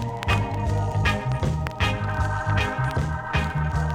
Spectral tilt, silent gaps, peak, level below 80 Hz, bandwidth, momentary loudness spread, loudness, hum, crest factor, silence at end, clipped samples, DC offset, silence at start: -6 dB/octave; none; -8 dBFS; -32 dBFS; 14 kHz; 2 LU; -25 LUFS; none; 16 dB; 0 s; under 0.1%; under 0.1%; 0 s